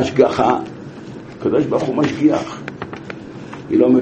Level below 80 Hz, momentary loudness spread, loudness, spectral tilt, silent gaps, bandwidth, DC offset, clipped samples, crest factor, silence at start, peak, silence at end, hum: -50 dBFS; 19 LU; -17 LUFS; -7 dB/octave; none; 8.4 kHz; under 0.1%; under 0.1%; 18 dB; 0 s; 0 dBFS; 0 s; none